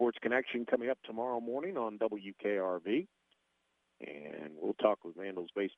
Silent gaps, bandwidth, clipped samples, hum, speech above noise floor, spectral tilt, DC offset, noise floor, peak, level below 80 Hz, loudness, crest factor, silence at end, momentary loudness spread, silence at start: none; 6 kHz; under 0.1%; none; 43 dB; -7.5 dB/octave; under 0.1%; -79 dBFS; -12 dBFS; -84 dBFS; -36 LUFS; 24 dB; 0.05 s; 13 LU; 0 s